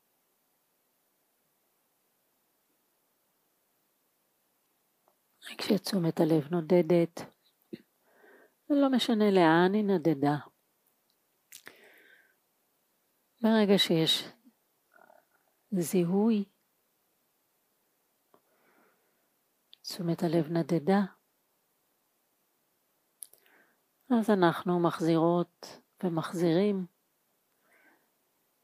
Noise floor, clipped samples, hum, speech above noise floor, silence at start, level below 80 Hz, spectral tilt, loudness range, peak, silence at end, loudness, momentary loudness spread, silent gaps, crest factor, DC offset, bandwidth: -75 dBFS; under 0.1%; none; 48 dB; 5.45 s; -86 dBFS; -6 dB/octave; 9 LU; -10 dBFS; 1.75 s; -28 LUFS; 23 LU; none; 20 dB; under 0.1%; 15.5 kHz